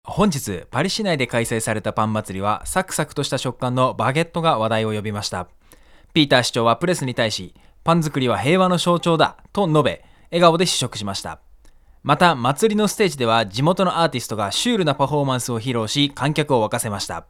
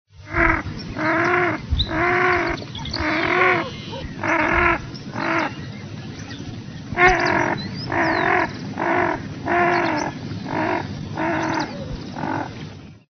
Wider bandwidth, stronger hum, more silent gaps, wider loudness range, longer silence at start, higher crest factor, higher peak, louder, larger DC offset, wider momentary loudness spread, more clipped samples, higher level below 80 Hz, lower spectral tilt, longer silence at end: first, 17 kHz vs 6.6 kHz; neither; neither; about the same, 3 LU vs 4 LU; about the same, 0.05 s vs 0.15 s; about the same, 20 dB vs 20 dB; about the same, 0 dBFS vs -2 dBFS; about the same, -20 LUFS vs -21 LUFS; neither; second, 9 LU vs 15 LU; neither; second, -48 dBFS vs -38 dBFS; about the same, -4.5 dB/octave vs -3.5 dB/octave; about the same, 0.1 s vs 0.15 s